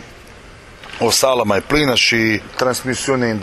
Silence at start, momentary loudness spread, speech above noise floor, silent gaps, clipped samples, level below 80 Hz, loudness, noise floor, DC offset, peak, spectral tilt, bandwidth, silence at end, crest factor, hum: 0 s; 7 LU; 23 dB; none; under 0.1%; -40 dBFS; -15 LUFS; -39 dBFS; under 0.1%; -2 dBFS; -3 dB/octave; 15 kHz; 0 s; 16 dB; none